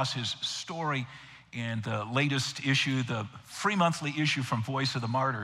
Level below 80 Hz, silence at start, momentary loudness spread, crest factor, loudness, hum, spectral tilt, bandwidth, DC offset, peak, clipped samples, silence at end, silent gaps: -70 dBFS; 0 s; 9 LU; 18 dB; -30 LUFS; none; -4.5 dB/octave; 13.5 kHz; under 0.1%; -12 dBFS; under 0.1%; 0 s; none